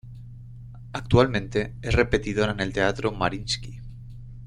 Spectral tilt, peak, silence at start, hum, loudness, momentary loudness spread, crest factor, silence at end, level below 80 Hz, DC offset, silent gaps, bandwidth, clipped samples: -5.5 dB/octave; -2 dBFS; 0.05 s; none; -24 LUFS; 22 LU; 24 dB; 0 s; -38 dBFS; under 0.1%; none; 11 kHz; under 0.1%